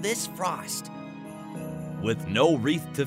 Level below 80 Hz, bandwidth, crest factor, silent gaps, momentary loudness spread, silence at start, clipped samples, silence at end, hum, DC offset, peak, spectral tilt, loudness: -60 dBFS; 16 kHz; 20 dB; none; 18 LU; 0 s; under 0.1%; 0 s; none; under 0.1%; -10 dBFS; -4.5 dB/octave; -28 LUFS